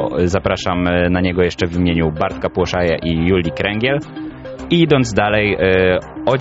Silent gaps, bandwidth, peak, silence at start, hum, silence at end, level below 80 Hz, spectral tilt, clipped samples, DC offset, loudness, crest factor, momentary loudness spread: none; 8 kHz; -2 dBFS; 0 s; none; 0 s; -34 dBFS; -5 dB/octave; under 0.1%; under 0.1%; -16 LUFS; 14 dB; 6 LU